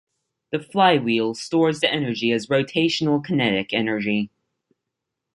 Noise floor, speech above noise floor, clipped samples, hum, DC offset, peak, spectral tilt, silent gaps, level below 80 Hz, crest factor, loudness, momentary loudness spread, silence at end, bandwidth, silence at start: -82 dBFS; 61 dB; under 0.1%; none; under 0.1%; -4 dBFS; -5.5 dB/octave; none; -62 dBFS; 20 dB; -21 LUFS; 8 LU; 1.05 s; 11.5 kHz; 0.5 s